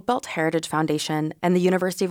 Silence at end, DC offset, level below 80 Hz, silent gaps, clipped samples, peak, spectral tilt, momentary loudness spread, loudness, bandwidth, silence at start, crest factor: 0 s; under 0.1%; -64 dBFS; none; under 0.1%; -10 dBFS; -5.5 dB/octave; 4 LU; -23 LUFS; 19 kHz; 0.1 s; 14 dB